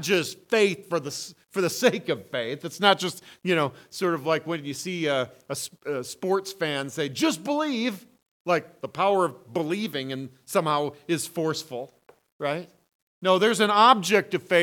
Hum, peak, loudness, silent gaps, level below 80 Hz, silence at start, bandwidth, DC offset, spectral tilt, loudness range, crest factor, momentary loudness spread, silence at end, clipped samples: none; -2 dBFS; -25 LUFS; 8.31-8.45 s, 12.32-12.39 s, 12.95-13.21 s; -76 dBFS; 0 s; 19 kHz; under 0.1%; -4 dB/octave; 5 LU; 24 dB; 12 LU; 0 s; under 0.1%